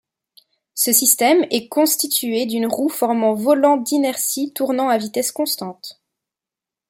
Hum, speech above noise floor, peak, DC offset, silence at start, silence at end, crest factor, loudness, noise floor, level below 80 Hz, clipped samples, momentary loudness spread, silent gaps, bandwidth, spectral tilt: none; 70 dB; 0 dBFS; under 0.1%; 0.75 s; 0.95 s; 18 dB; -17 LUFS; -88 dBFS; -70 dBFS; under 0.1%; 9 LU; none; 16.5 kHz; -2 dB/octave